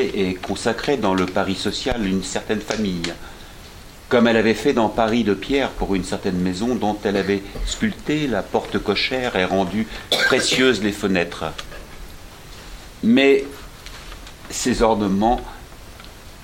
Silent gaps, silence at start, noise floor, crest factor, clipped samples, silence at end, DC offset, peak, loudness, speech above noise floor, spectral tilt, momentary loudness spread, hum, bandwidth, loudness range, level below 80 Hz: none; 0 s; -40 dBFS; 18 dB; under 0.1%; 0 s; under 0.1%; -2 dBFS; -20 LUFS; 20 dB; -4.5 dB/octave; 23 LU; none; 16.5 kHz; 3 LU; -38 dBFS